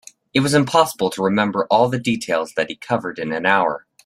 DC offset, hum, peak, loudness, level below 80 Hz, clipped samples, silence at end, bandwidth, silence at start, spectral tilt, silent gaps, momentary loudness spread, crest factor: under 0.1%; none; -2 dBFS; -19 LUFS; -60 dBFS; under 0.1%; 0.25 s; 16 kHz; 0.35 s; -5 dB/octave; none; 7 LU; 18 dB